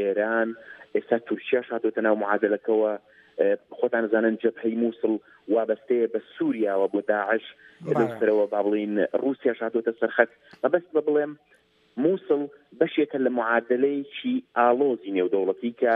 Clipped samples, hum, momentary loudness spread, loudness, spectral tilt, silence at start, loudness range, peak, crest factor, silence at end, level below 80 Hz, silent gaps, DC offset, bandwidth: under 0.1%; none; 6 LU; -25 LUFS; -8 dB/octave; 0 s; 2 LU; -2 dBFS; 22 dB; 0 s; -78 dBFS; none; under 0.1%; 4 kHz